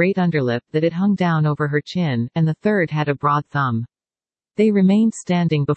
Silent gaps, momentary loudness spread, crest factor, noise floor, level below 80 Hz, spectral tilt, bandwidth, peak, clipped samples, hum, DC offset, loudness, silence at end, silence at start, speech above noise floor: none; 6 LU; 14 dB; under -90 dBFS; -60 dBFS; -7.5 dB/octave; 8.6 kHz; -4 dBFS; under 0.1%; none; under 0.1%; -19 LUFS; 0 s; 0 s; over 72 dB